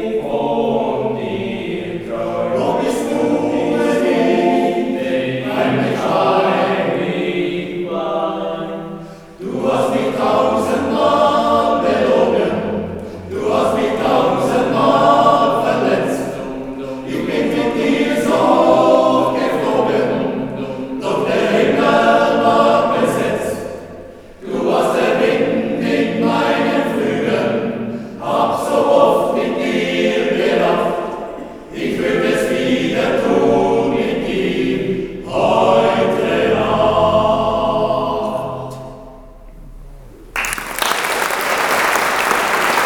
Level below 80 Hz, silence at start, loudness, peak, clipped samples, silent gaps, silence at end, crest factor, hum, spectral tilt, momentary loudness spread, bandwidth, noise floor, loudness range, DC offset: -44 dBFS; 0 s; -16 LUFS; 0 dBFS; under 0.1%; none; 0 s; 16 dB; none; -5 dB/octave; 11 LU; over 20 kHz; -37 dBFS; 4 LU; under 0.1%